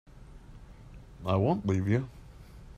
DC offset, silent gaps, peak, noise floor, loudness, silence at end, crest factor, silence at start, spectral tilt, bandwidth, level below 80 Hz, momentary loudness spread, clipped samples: under 0.1%; none; -12 dBFS; -49 dBFS; -30 LUFS; 0.05 s; 20 dB; 0.15 s; -8.5 dB/octave; 8.6 kHz; -52 dBFS; 25 LU; under 0.1%